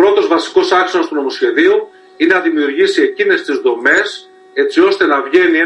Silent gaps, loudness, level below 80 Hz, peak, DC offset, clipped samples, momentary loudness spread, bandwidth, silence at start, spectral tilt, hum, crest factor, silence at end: none; -13 LUFS; -60 dBFS; 0 dBFS; under 0.1%; under 0.1%; 6 LU; 10.5 kHz; 0 s; -3 dB/octave; none; 12 dB; 0 s